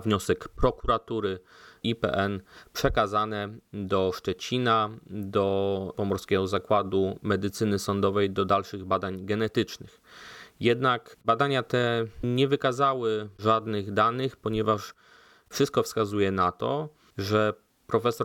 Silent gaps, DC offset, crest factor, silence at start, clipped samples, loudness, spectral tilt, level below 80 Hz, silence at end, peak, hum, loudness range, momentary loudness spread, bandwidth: none; under 0.1%; 18 dB; 0 s; under 0.1%; -27 LUFS; -5.5 dB/octave; -48 dBFS; 0 s; -10 dBFS; none; 2 LU; 9 LU; 18 kHz